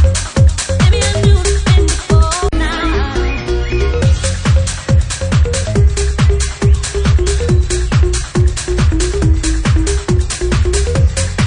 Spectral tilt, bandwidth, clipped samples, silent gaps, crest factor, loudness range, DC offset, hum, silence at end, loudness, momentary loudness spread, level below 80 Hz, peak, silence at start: -5 dB/octave; 10.5 kHz; under 0.1%; none; 12 dB; 2 LU; under 0.1%; none; 0 s; -14 LUFS; 4 LU; -16 dBFS; 0 dBFS; 0 s